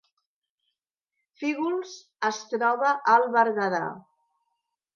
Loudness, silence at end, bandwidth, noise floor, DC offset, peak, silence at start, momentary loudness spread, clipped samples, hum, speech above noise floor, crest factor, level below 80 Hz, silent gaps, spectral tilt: -25 LUFS; 0.95 s; 7.2 kHz; -84 dBFS; under 0.1%; -8 dBFS; 1.4 s; 12 LU; under 0.1%; none; 59 dB; 20 dB; -84 dBFS; none; -4.5 dB/octave